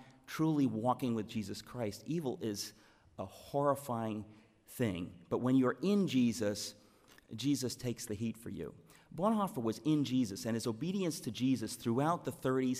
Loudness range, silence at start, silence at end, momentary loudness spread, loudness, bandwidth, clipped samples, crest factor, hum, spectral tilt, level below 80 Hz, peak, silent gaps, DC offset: 4 LU; 0 s; 0 s; 13 LU; -36 LUFS; 15.5 kHz; under 0.1%; 16 dB; none; -6 dB/octave; -70 dBFS; -18 dBFS; none; under 0.1%